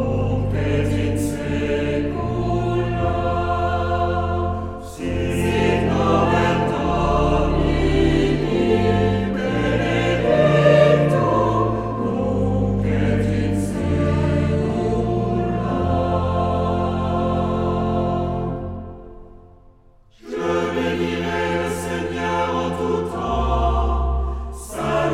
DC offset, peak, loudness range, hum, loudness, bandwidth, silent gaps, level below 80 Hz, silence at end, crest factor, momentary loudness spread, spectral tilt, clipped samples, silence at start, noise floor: under 0.1%; -2 dBFS; 7 LU; none; -20 LUFS; 14.5 kHz; none; -30 dBFS; 0 s; 18 dB; 6 LU; -7 dB/octave; under 0.1%; 0 s; -50 dBFS